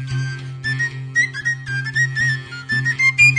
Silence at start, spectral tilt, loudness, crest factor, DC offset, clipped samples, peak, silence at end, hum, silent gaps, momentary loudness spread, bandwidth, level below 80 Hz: 0 s; -3.5 dB/octave; -19 LUFS; 16 dB; under 0.1%; under 0.1%; -2 dBFS; 0 s; none; none; 10 LU; 10.5 kHz; -52 dBFS